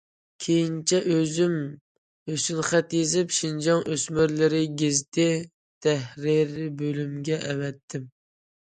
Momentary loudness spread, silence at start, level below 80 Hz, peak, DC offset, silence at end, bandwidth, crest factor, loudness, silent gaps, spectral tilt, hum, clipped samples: 10 LU; 0.4 s; -62 dBFS; -8 dBFS; under 0.1%; 0.6 s; 9.6 kHz; 18 dB; -25 LUFS; 1.81-2.26 s, 5.08-5.12 s, 5.54-5.81 s, 7.83-7.88 s; -4.5 dB/octave; none; under 0.1%